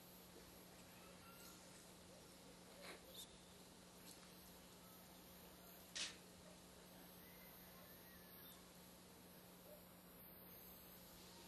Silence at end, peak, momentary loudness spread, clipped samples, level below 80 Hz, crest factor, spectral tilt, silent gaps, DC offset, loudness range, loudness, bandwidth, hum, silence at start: 0 s; -34 dBFS; 5 LU; under 0.1%; -78 dBFS; 26 dB; -2.5 dB/octave; none; under 0.1%; 5 LU; -59 LUFS; 14.5 kHz; none; 0 s